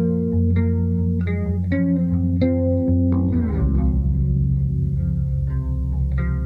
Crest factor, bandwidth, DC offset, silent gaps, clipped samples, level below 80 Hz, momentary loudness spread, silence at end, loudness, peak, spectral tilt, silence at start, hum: 12 dB; 4.3 kHz; under 0.1%; none; under 0.1%; -26 dBFS; 4 LU; 0 s; -21 LUFS; -8 dBFS; -12 dB/octave; 0 s; none